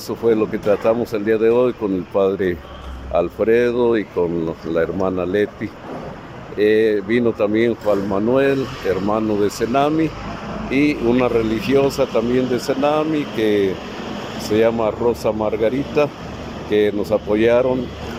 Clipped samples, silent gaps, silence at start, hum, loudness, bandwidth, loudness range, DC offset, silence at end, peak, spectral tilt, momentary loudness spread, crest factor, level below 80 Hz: under 0.1%; none; 0 s; none; -19 LUFS; 16 kHz; 2 LU; under 0.1%; 0 s; -4 dBFS; -6.5 dB/octave; 12 LU; 14 dB; -42 dBFS